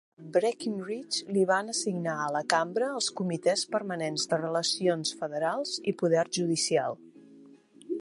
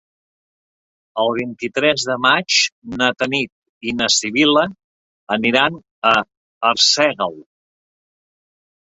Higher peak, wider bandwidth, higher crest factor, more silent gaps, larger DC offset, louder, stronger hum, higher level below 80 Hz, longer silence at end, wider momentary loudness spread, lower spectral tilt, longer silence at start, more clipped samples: second, -6 dBFS vs 0 dBFS; first, 11.5 kHz vs 8.2 kHz; first, 24 dB vs 18 dB; second, none vs 2.72-2.82 s, 3.52-3.81 s, 4.84-5.27 s, 5.91-6.02 s, 6.37-6.61 s; neither; second, -29 LUFS vs -17 LUFS; neither; second, -80 dBFS vs -58 dBFS; second, 0 s vs 1.4 s; second, 6 LU vs 11 LU; first, -3.5 dB/octave vs -2 dB/octave; second, 0.2 s vs 1.15 s; neither